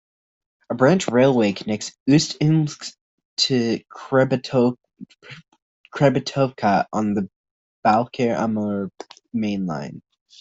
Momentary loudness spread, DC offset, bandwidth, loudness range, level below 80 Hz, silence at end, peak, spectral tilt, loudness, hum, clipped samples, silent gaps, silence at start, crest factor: 15 LU; under 0.1%; 8.2 kHz; 4 LU; -60 dBFS; 0.4 s; -4 dBFS; -5.5 dB/octave; -21 LUFS; none; under 0.1%; 2.00-2.06 s, 3.01-3.18 s, 3.25-3.37 s, 5.62-5.84 s, 7.36-7.44 s, 7.51-7.83 s; 0.7 s; 18 dB